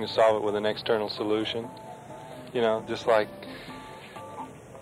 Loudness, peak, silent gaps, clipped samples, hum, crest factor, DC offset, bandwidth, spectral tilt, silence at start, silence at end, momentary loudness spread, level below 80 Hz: -27 LUFS; -10 dBFS; none; under 0.1%; none; 18 dB; under 0.1%; 15 kHz; -5 dB/octave; 0 s; 0 s; 19 LU; -64 dBFS